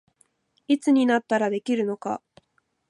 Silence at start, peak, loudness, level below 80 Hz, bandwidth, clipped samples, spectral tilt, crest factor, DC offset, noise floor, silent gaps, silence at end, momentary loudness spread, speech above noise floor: 0.7 s; -10 dBFS; -24 LUFS; -78 dBFS; 11.5 kHz; under 0.1%; -5.5 dB/octave; 16 dB; under 0.1%; -70 dBFS; none; 0.75 s; 12 LU; 48 dB